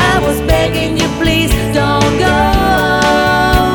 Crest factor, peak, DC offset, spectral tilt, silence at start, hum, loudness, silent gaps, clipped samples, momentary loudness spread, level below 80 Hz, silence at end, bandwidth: 12 dB; 0 dBFS; under 0.1%; -5 dB/octave; 0 s; none; -12 LUFS; none; under 0.1%; 3 LU; -20 dBFS; 0 s; 19 kHz